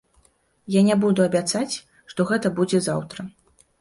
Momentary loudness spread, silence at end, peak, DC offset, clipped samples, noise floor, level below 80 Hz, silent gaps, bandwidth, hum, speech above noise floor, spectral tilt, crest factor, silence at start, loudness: 16 LU; 0.5 s; -6 dBFS; under 0.1%; under 0.1%; -61 dBFS; -62 dBFS; none; 11.5 kHz; none; 40 dB; -5.5 dB/octave; 16 dB; 0.7 s; -22 LUFS